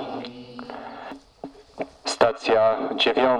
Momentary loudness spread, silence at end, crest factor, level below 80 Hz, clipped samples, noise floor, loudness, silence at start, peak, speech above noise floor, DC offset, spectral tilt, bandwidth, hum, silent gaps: 21 LU; 0 s; 20 dB; -60 dBFS; under 0.1%; -43 dBFS; -22 LUFS; 0 s; -4 dBFS; 22 dB; under 0.1%; -3.5 dB/octave; 11.5 kHz; none; none